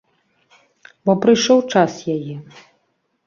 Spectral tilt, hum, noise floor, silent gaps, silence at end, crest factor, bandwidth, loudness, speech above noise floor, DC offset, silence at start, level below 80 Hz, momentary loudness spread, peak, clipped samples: -5 dB/octave; none; -68 dBFS; none; 0.85 s; 18 dB; 7.4 kHz; -17 LUFS; 51 dB; under 0.1%; 1.05 s; -62 dBFS; 14 LU; -2 dBFS; under 0.1%